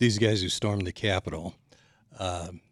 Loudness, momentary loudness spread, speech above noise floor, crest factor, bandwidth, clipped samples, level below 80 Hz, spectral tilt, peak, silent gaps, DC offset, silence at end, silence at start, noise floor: -29 LUFS; 12 LU; 31 dB; 20 dB; 12.5 kHz; under 0.1%; -52 dBFS; -5 dB/octave; -10 dBFS; none; under 0.1%; 0.15 s; 0 s; -59 dBFS